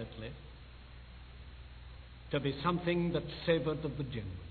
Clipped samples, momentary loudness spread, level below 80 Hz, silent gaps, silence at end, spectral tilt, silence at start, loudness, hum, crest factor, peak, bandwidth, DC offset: under 0.1%; 21 LU; -52 dBFS; none; 0 s; -5.5 dB/octave; 0 s; -35 LUFS; none; 22 dB; -16 dBFS; 4.6 kHz; under 0.1%